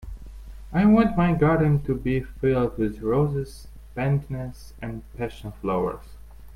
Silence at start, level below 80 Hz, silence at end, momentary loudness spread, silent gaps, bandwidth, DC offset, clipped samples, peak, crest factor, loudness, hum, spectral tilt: 0 s; -40 dBFS; 0 s; 19 LU; none; 13.5 kHz; under 0.1%; under 0.1%; -6 dBFS; 18 dB; -24 LUFS; none; -9 dB/octave